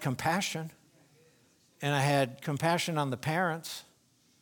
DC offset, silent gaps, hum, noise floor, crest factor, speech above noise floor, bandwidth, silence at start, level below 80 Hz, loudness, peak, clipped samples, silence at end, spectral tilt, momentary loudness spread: under 0.1%; none; none; -67 dBFS; 20 dB; 37 dB; 19.5 kHz; 0 s; -70 dBFS; -31 LUFS; -12 dBFS; under 0.1%; 0.6 s; -4.5 dB/octave; 12 LU